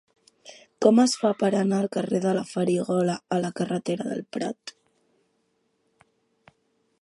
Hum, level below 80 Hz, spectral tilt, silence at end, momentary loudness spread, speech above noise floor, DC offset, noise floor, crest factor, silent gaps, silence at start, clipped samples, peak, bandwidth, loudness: none; -74 dBFS; -6 dB/octave; 2.3 s; 12 LU; 48 dB; under 0.1%; -71 dBFS; 22 dB; none; 0.45 s; under 0.1%; -4 dBFS; 11.5 kHz; -25 LUFS